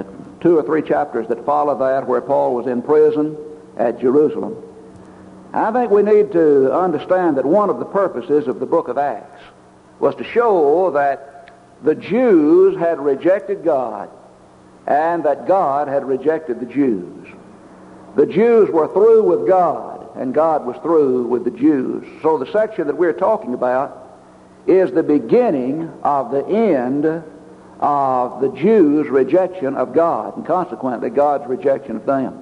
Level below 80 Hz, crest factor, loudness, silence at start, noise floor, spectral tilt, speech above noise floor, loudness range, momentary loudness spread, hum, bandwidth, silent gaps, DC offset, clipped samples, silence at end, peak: -60 dBFS; 14 dB; -17 LUFS; 0 s; -45 dBFS; -8.5 dB/octave; 29 dB; 3 LU; 10 LU; none; 7 kHz; none; under 0.1%; under 0.1%; 0 s; -2 dBFS